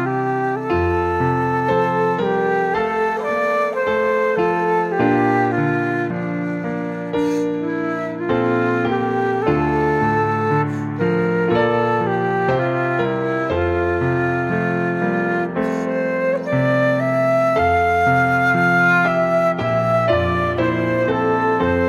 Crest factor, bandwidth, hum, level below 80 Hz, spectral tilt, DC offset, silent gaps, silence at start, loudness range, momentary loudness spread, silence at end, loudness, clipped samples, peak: 14 dB; 13 kHz; none; -44 dBFS; -7.5 dB/octave; under 0.1%; none; 0 s; 4 LU; 5 LU; 0 s; -18 LUFS; under 0.1%; -4 dBFS